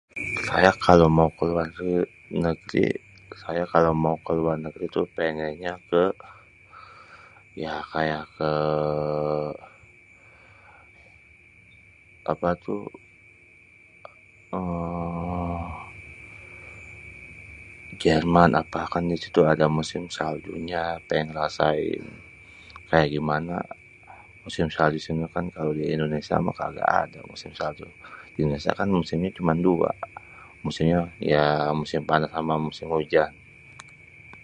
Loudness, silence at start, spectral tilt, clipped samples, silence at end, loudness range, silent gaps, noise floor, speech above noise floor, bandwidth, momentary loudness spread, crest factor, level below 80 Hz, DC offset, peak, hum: -25 LUFS; 0.15 s; -7 dB/octave; under 0.1%; 0.05 s; 10 LU; none; -53 dBFS; 29 dB; 10.5 kHz; 22 LU; 26 dB; -48 dBFS; under 0.1%; 0 dBFS; none